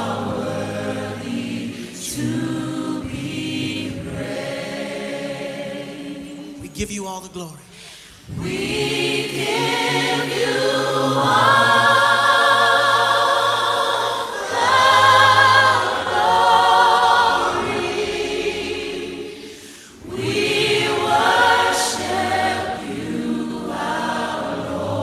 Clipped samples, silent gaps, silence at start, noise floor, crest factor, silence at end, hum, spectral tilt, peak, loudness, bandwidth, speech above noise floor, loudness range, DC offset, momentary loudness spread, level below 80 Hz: under 0.1%; none; 0 s; -41 dBFS; 18 dB; 0 s; none; -3.5 dB/octave; 0 dBFS; -18 LUFS; 15.5 kHz; 21 dB; 14 LU; under 0.1%; 17 LU; -48 dBFS